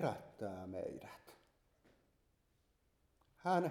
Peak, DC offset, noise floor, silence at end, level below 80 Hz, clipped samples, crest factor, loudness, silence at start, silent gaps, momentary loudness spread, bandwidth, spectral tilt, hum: -22 dBFS; under 0.1%; -78 dBFS; 0 s; -78 dBFS; under 0.1%; 22 dB; -43 LUFS; 0 s; none; 18 LU; 17.5 kHz; -7 dB/octave; none